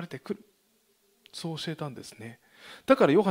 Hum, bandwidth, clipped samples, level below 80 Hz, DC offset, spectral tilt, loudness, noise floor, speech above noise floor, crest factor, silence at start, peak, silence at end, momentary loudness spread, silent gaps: none; 16 kHz; under 0.1%; -72 dBFS; under 0.1%; -6 dB/octave; -28 LUFS; -69 dBFS; 41 dB; 22 dB; 0 s; -8 dBFS; 0 s; 25 LU; none